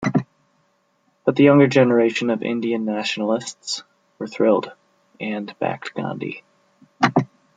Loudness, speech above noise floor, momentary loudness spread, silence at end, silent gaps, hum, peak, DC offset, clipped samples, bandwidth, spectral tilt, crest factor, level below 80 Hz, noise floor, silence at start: -20 LUFS; 46 dB; 17 LU; 0.3 s; none; none; -2 dBFS; under 0.1%; under 0.1%; 9.2 kHz; -6 dB/octave; 20 dB; -66 dBFS; -65 dBFS; 0 s